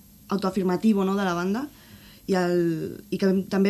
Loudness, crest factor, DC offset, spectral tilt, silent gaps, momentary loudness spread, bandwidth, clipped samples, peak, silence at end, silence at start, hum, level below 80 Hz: -25 LUFS; 14 dB; under 0.1%; -7 dB/octave; none; 10 LU; 13.5 kHz; under 0.1%; -10 dBFS; 0 s; 0.3 s; none; -58 dBFS